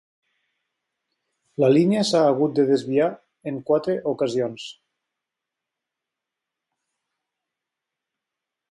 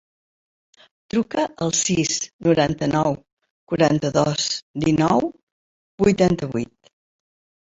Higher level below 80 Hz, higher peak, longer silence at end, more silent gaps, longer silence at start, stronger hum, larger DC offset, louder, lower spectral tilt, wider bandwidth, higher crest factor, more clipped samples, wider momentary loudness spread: second, -70 dBFS vs -50 dBFS; second, -6 dBFS vs -2 dBFS; first, 4 s vs 1.05 s; second, none vs 2.33-2.39 s, 3.33-3.37 s, 3.50-3.67 s, 4.63-4.74 s, 5.43-5.98 s; first, 1.6 s vs 1.15 s; neither; neither; about the same, -21 LUFS vs -21 LUFS; first, -6 dB/octave vs -4.5 dB/octave; first, 11.5 kHz vs 8 kHz; about the same, 18 dB vs 20 dB; neither; first, 17 LU vs 9 LU